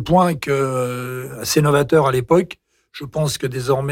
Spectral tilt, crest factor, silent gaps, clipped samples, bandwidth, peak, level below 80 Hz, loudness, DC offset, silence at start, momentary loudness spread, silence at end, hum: -5.5 dB/octave; 14 dB; none; under 0.1%; 17 kHz; -4 dBFS; -46 dBFS; -18 LUFS; under 0.1%; 0 s; 14 LU; 0 s; none